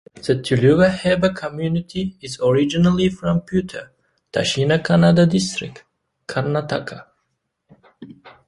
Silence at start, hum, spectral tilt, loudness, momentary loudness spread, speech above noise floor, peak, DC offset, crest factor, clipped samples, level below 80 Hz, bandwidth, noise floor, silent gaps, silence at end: 0.15 s; none; -6 dB/octave; -19 LUFS; 14 LU; 55 dB; -2 dBFS; under 0.1%; 18 dB; under 0.1%; -48 dBFS; 11.5 kHz; -73 dBFS; none; 0.2 s